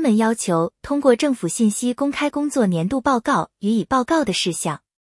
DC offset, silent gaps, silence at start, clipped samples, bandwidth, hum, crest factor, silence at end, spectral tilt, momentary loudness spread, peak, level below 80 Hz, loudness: under 0.1%; none; 0 s; under 0.1%; 12 kHz; none; 16 dB; 0.25 s; -5 dB/octave; 4 LU; -2 dBFS; -52 dBFS; -20 LUFS